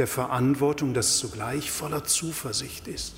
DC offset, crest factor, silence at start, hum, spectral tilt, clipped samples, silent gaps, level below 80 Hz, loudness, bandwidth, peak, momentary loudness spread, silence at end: under 0.1%; 16 dB; 0 s; none; -3.5 dB/octave; under 0.1%; none; -50 dBFS; -26 LUFS; 16 kHz; -10 dBFS; 8 LU; 0 s